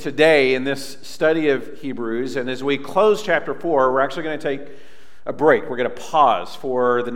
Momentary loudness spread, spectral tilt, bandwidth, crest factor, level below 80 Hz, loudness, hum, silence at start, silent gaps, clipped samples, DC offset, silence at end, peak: 11 LU; -5 dB/octave; 16 kHz; 18 dB; -62 dBFS; -19 LUFS; none; 0 s; none; under 0.1%; 3%; 0 s; -2 dBFS